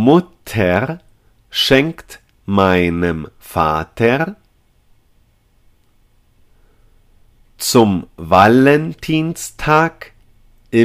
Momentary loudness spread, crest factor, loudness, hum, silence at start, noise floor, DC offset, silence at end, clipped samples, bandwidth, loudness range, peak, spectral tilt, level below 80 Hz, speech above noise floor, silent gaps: 13 LU; 16 dB; -15 LUFS; none; 0 s; -55 dBFS; under 0.1%; 0 s; under 0.1%; 16 kHz; 8 LU; 0 dBFS; -5.5 dB/octave; -42 dBFS; 40 dB; none